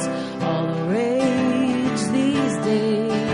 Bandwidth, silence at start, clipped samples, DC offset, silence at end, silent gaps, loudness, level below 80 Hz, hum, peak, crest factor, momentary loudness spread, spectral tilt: 11.5 kHz; 0 s; under 0.1%; under 0.1%; 0 s; none; -21 LUFS; -58 dBFS; none; -8 dBFS; 12 dB; 4 LU; -6 dB/octave